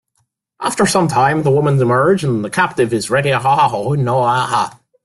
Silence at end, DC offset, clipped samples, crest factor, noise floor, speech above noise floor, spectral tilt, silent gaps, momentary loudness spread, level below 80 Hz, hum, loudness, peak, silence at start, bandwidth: 0.35 s; under 0.1%; under 0.1%; 14 dB; -66 dBFS; 52 dB; -5.5 dB/octave; none; 5 LU; -50 dBFS; none; -15 LUFS; -2 dBFS; 0.6 s; 12.5 kHz